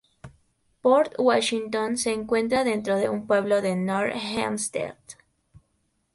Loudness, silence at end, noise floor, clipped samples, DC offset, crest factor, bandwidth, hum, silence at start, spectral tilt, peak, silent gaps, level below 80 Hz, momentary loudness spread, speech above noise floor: -24 LUFS; 0.55 s; -72 dBFS; under 0.1%; under 0.1%; 18 dB; 11.5 kHz; none; 0.25 s; -4 dB/octave; -8 dBFS; none; -62 dBFS; 7 LU; 48 dB